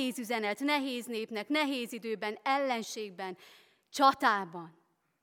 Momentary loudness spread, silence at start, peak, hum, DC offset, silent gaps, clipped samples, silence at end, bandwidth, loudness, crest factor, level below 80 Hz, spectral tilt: 15 LU; 0 s; -10 dBFS; none; under 0.1%; none; under 0.1%; 0.55 s; 18 kHz; -32 LUFS; 22 dB; -82 dBFS; -3 dB/octave